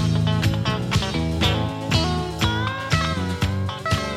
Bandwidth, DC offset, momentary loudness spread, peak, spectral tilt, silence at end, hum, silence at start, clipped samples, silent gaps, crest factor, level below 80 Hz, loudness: 13.5 kHz; under 0.1%; 3 LU; -4 dBFS; -5.5 dB/octave; 0 s; none; 0 s; under 0.1%; none; 18 dB; -34 dBFS; -22 LUFS